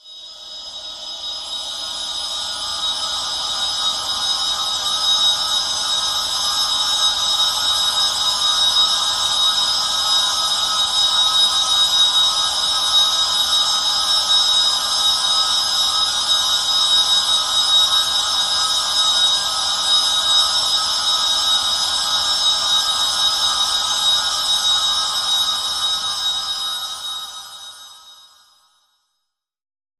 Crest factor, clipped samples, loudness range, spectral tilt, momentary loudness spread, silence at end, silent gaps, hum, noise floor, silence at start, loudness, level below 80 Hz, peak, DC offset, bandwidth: 16 dB; under 0.1%; 7 LU; 2 dB/octave; 10 LU; 1.85 s; none; none; -77 dBFS; 0.05 s; -15 LUFS; -52 dBFS; -4 dBFS; under 0.1%; 15.5 kHz